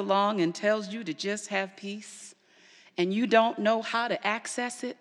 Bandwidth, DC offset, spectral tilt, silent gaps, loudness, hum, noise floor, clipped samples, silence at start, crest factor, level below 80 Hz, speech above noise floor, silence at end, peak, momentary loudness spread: 12 kHz; under 0.1%; -4 dB/octave; none; -28 LUFS; none; -58 dBFS; under 0.1%; 0 s; 22 dB; under -90 dBFS; 30 dB; 0.05 s; -8 dBFS; 16 LU